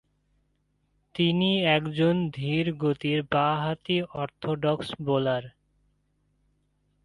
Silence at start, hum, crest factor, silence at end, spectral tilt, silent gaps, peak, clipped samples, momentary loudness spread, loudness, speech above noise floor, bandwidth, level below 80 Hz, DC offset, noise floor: 1.15 s; 50 Hz at -50 dBFS; 18 dB; 1.55 s; -7.5 dB/octave; none; -10 dBFS; under 0.1%; 8 LU; -26 LUFS; 46 dB; 11 kHz; -60 dBFS; under 0.1%; -72 dBFS